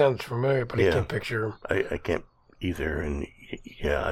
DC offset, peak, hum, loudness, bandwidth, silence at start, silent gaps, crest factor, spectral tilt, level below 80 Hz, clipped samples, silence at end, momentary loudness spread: under 0.1%; -10 dBFS; none; -28 LUFS; 15 kHz; 0 s; none; 18 dB; -6.5 dB/octave; -42 dBFS; under 0.1%; 0 s; 11 LU